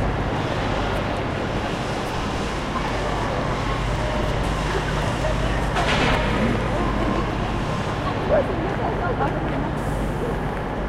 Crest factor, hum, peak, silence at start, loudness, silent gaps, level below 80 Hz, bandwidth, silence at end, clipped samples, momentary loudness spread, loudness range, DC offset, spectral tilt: 16 dB; none; -6 dBFS; 0 s; -23 LUFS; none; -30 dBFS; 13.5 kHz; 0 s; under 0.1%; 5 LU; 3 LU; under 0.1%; -6 dB/octave